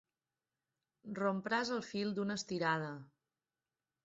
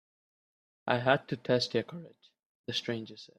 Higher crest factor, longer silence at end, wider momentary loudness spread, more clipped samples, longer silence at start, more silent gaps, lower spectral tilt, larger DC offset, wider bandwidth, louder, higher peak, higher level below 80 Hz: second, 20 dB vs 26 dB; first, 1 s vs 0.15 s; second, 12 LU vs 16 LU; neither; first, 1.05 s vs 0.85 s; second, none vs 2.46-2.64 s; about the same, -4 dB/octave vs -5 dB/octave; neither; second, 7.6 kHz vs 13 kHz; second, -38 LUFS vs -31 LUFS; second, -22 dBFS vs -8 dBFS; second, -80 dBFS vs -74 dBFS